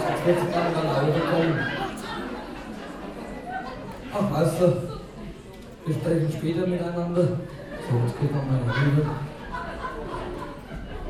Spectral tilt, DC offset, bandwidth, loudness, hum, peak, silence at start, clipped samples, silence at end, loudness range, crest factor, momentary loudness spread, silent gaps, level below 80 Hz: -7 dB/octave; under 0.1%; 14.5 kHz; -26 LUFS; none; -8 dBFS; 0 s; under 0.1%; 0 s; 3 LU; 18 dB; 14 LU; none; -46 dBFS